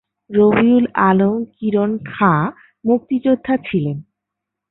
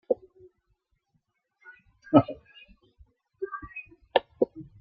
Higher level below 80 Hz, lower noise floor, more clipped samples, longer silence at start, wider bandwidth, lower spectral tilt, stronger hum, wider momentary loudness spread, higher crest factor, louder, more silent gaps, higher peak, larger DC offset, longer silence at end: first, -54 dBFS vs -62 dBFS; first, -81 dBFS vs -75 dBFS; neither; first, 0.3 s vs 0.1 s; second, 4.1 kHz vs 4.9 kHz; first, -12.5 dB/octave vs -5.5 dB/octave; neither; second, 9 LU vs 19 LU; second, 16 dB vs 28 dB; first, -17 LUFS vs -28 LUFS; neither; about the same, -2 dBFS vs -4 dBFS; neither; first, 0.7 s vs 0.2 s